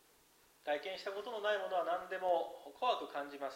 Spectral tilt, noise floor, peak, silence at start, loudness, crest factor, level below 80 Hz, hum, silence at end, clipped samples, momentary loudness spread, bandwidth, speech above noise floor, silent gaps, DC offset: -3 dB/octave; -68 dBFS; -22 dBFS; 0.65 s; -39 LUFS; 18 dB; -82 dBFS; none; 0 s; under 0.1%; 7 LU; 16 kHz; 30 dB; none; under 0.1%